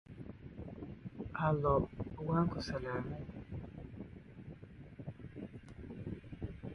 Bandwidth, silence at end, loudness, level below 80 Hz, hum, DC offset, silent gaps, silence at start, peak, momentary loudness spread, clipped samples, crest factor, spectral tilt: 11 kHz; 0 s; -40 LUFS; -54 dBFS; none; under 0.1%; none; 0.1 s; -18 dBFS; 18 LU; under 0.1%; 22 dB; -8 dB/octave